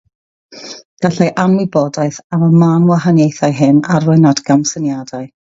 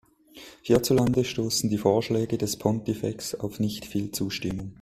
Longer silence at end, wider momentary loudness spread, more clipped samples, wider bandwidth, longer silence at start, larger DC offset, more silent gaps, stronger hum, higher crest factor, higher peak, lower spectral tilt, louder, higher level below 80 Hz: about the same, 0.15 s vs 0.1 s; first, 14 LU vs 10 LU; neither; second, 7.8 kHz vs 16 kHz; first, 0.5 s vs 0.35 s; neither; first, 0.85-0.97 s, 2.24-2.30 s vs none; neither; second, 12 dB vs 20 dB; first, 0 dBFS vs -6 dBFS; first, -6.5 dB/octave vs -5 dB/octave; first, -12 LUFS vs -26 LUFS; about the same, -54 dBFS vs -52 dBFS